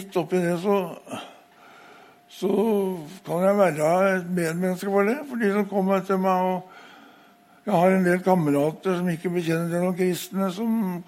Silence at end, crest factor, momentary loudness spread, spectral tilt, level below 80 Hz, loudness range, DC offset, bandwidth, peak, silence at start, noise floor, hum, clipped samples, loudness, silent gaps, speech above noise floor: 0.05 s; 18 dB; 10 LU; -6.5 dB/octave; -70 dBFS; 3 LU; under 0.1%; 16 kHz; -6 dBFS; 0 s; -54 dBFS; none; under 0.1%; -23 LUFS; none; 31 dB